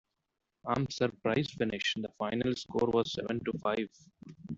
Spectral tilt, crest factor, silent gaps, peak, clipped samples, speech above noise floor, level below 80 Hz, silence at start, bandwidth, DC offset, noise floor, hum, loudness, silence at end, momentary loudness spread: -5.5 dB/octave; 18 dB; none; -16 dBFS; under 0.1%; 52 dB; -64 dBFS; 0.65 s; 7.8 kHz; under 0.1%; -85 dBFS; none; -33 LUFS; 0 s; 6 LU